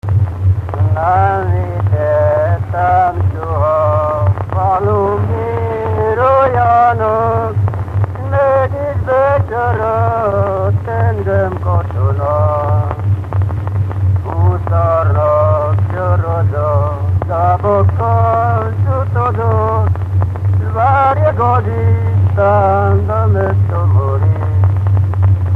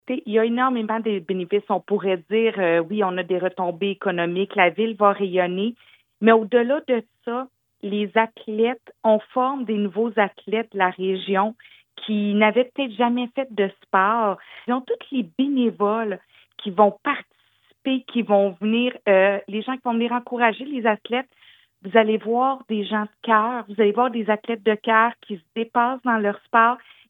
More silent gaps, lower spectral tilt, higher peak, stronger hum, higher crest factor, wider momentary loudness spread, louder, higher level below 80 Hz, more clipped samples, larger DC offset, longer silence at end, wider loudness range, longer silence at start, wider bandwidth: neither; first, -10 dB/octave vs -8.5 dB/octave; about the same, 0 dBFS vs 0 dBFS; neither; second, 12 dB vs 20 dB; second, 5 LU vs 9 LU; first, -14 LUFS vs -22 LUFS; first, -32 dBFS vs -84 dBFS; neither; neither; second, 0 s vs 0.3 s; about the same, 2 LU vs 2 LU; about the same, 0.05 s vs 0.1 s; second, 3.5 kHz vs 4 kHz